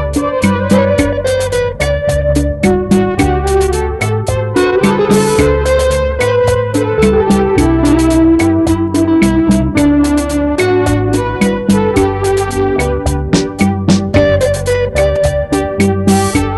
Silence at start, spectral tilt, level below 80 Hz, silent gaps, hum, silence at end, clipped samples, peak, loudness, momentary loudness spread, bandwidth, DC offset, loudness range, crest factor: 0 s; -6 dB/octave; -22 dBFS; none; none; 0 s; under 0.1%; 0 dBFS; -12 LUFS; 4 LU; 12.5 kHz; under 0.1%; 2 LU; 12 dB